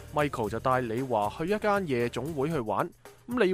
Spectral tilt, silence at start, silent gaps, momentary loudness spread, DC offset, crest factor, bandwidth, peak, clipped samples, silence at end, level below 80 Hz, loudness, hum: -6.5 dB/octave; 0 s; none; 4 LU; under 0.1%; 18 dB; 15.5 kHz; -12 dBFS; under 0.1%; 0 s; -54 dBFS; -29 LUFS; none